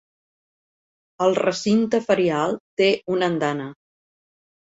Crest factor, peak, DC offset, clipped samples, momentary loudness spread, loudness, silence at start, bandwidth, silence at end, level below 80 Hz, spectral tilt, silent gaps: 18 dB; -4 dBFS; under 0.1%; under 0.1%; 6 LU; -21 LUFS; 1.2 s; 8 kHz; 0.95 s; -66 dBFS; -5.5 dB/octave; 2.60-2.77 s